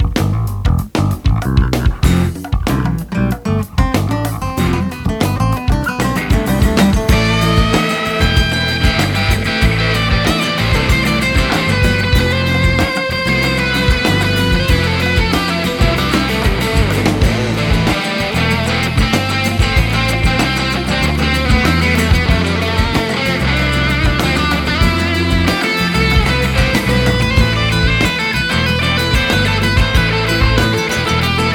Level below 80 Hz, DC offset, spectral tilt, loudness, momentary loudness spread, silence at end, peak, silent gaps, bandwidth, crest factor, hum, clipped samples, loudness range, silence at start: -20 dBFS; under 0.1%; -5 dB/octave; -14 LUFS; 4 LU; 0 s; 0 dBFS; none; 18.5 kHz; 14 dB; none; under 0.1%; 3 LU; 0 s